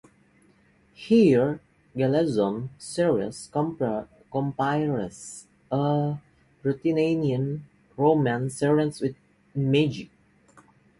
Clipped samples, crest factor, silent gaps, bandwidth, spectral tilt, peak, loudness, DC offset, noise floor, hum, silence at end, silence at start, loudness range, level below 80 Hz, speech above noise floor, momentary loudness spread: under 0.1%; 18 dB; none; 11.5 kHz; -7 dB/octave; -8 dBFS; -25 LUFS; under 0.1%; -61 dBFS; none; 0.95 s; 1 s; 4 LU; -60 dBFS; 37 dB; 15 LU